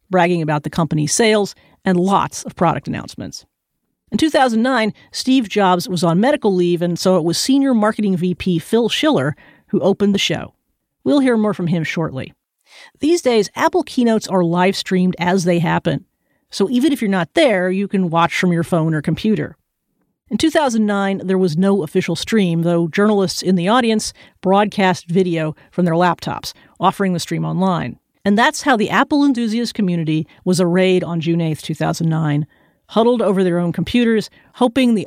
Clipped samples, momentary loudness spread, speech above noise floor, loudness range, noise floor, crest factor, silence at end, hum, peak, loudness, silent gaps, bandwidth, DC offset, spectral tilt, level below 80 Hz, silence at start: under 0.1%; 9 LU; 57 dB; 3 LU; -73 dBFS; 16 dB; 0 s; none; -2 dBFS; -17 LUFS; none; 15.5 kHz; under 0.1%; -5.5 dB/octave; -52 dBFS; 0.1 s